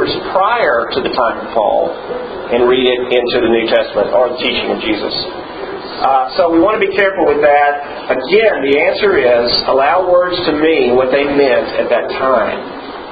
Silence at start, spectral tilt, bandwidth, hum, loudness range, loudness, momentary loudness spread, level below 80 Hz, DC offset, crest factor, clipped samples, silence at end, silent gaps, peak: 0 s; -7.5 dB/octave; 5 kHz; none; 3 LU; -13 LUFS; 9 LU; -44 dBFS; under 0.1%; 12 dB; under 0.1%; 0 s; none; 0 dBFS